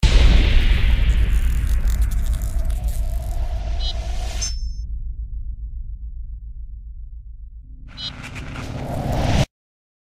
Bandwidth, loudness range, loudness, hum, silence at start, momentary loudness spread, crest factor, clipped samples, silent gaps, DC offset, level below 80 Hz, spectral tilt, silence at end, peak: 15 kHz; 13 LU; -24 LUFS; none; 0 s; 19 LU; 18 dB; under 0.1%; none; under 0.1%; -20 dBFS; -5 dB/octave; 0.6 s; -2 dBFS